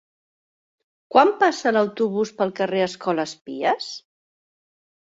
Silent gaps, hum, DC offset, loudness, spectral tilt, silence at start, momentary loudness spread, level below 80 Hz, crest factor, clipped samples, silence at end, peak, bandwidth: 3.41-3.45 s; none; under 0.1%; -21 LUFS; -4.5 dB/octave; 1.1 s; 10 LU; -72 dBFS; 22 dB; under 0.1%; 1.05 s; 0 dBFS; 8 kHz